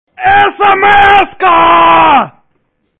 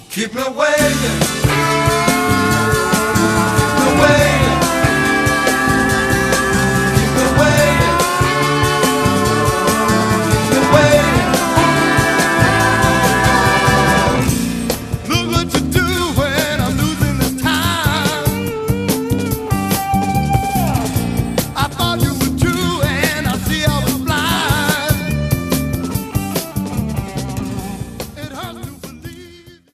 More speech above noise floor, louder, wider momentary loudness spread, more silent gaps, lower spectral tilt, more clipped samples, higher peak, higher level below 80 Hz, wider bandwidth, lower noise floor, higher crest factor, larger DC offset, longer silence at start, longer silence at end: first, 54 dB vs 25 dB; first, -6 LUFS vs -15 LUFS; second, 4 LU vs 9 LU; neither; about the same, -5.5 dB/octave vs -4.5 dB/octave; first, 0.2% vs under 0.1%; about the same, 0 dBFS vs 0 dBFS; second, -36 dBFS vs -30 dBFS; second, 4.9 kHz vs 16 kHz; first, -60 dBFS vs -41 dBFS; second, 8 dB vs 14 dB; neither; first, 0.2 s vs 0 s; first, 0.7 s vs 0.25 s